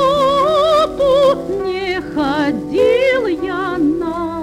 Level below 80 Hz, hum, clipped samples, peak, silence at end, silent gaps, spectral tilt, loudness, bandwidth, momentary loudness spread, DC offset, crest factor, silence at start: -42 dBFS; none; under 0.1%; -4 dBFS; 0 s; none; -5.5 dB/octave; -15 LUFS; 14.5 kHz; 7 LU; under 0.1%; 12 dB; 0 s